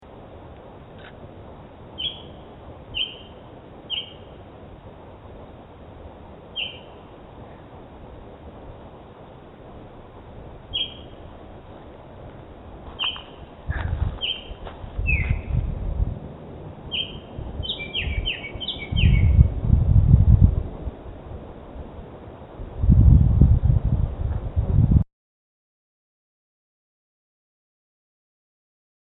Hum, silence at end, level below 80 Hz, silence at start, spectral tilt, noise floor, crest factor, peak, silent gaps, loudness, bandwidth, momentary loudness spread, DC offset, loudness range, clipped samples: none; 4.05 s; -28 dBFS; 0.05 s; -10.5 dB/octave; -43 dBFS; 24 dB; 0 dBFS; none; -22 LUFS; 4.1 kHz; 25 LU; under 0.1%; 17 LU; under 0.1%